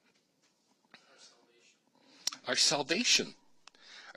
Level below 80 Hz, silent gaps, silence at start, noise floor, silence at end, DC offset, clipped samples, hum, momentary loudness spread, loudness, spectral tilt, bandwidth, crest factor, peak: -90 dBFS; none; 2.25 s; -73 dBFS; 0.05 s; under 0.1%; under 0.1%; none; 15 LU; -29 LUFS; -0.5 dB/octave; 15 kHz; 26 dB; -10 dBFS